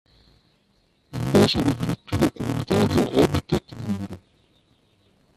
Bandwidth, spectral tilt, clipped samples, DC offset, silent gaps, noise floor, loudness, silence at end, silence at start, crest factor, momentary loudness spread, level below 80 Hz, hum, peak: 14 kHz; -6 dB/octave; under 0.1%; under 0.1%; none; -64 dBFS; -23 LUFS; 1.2 s; 1.15 s; 20 dB; 12 LU; -46 dBFS; none; -4 dBFS